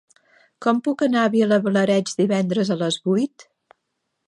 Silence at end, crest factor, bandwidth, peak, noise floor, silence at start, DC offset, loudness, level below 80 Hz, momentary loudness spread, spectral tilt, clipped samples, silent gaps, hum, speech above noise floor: 0.85 s; 16 dB; 11.5 kHz; -4 dBFS; -76 dBFS; 0.6 s; under 0.1%; -20 LUFS; -72 dBFS; 4 LU; -5.5 dB/octave; under 0.1%; none; none; 57 dB